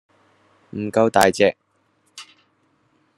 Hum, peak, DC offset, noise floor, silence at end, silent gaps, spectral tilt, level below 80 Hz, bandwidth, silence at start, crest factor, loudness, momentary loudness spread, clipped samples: none; 0 dBFS; under 0.1%; -65 dBFS; 0.95 s; none; -4.5 dB/octave; -58 dBFS; 12.5 kHz; 0.75 s; 22 dB; -18 LUFS; 25 LU; under 0.1%